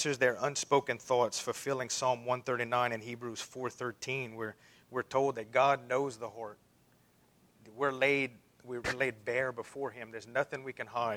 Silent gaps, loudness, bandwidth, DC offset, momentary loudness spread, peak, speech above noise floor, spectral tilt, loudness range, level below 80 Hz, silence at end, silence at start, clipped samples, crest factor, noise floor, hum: none; -34 LUFS; 16.5 kHz; under 0.1%; 12 LU; -14 dBFS; 33 dB; -3.5 dB/octave; 3 LU; -72 dBFS; 0 s; 0 s; under 0.1%; 20 dB; -67 dBFS; none